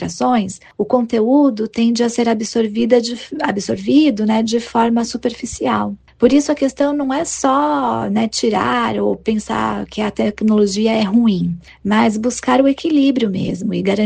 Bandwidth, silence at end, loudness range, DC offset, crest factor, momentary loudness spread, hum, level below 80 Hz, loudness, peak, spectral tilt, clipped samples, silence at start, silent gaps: 9.6 kHz; 0 s; 2 LU; under 0.1%; 16 dB; 7 LU; none; -48 dBFS; -16 LUFS; 0 dBFS; -5 dB/octave; under 0.1%; 0 s; none